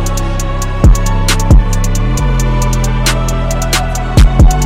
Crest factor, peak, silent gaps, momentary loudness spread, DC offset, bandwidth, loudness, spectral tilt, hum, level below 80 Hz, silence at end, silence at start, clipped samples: 10 dB; 0 dBFS; none; 7 LU; under 0.1%; 16 kHz; -12 LUFS; -5 dB/octave; none; -12 dBFS; 0 s; 0 s; under 0.1%